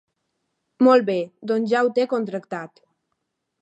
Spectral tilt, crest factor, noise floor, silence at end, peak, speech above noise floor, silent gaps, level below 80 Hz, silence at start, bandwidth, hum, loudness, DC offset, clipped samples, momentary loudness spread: -6.5 dB/octave; 18 dB; -77 dBFS; 0.95 s; -4 dBFS; 57 dB; none; -80 dBFS; 0.8 s; 8.2 kHz; none; -21 LUFS; under 0.1%; under 0.1%; 17 LU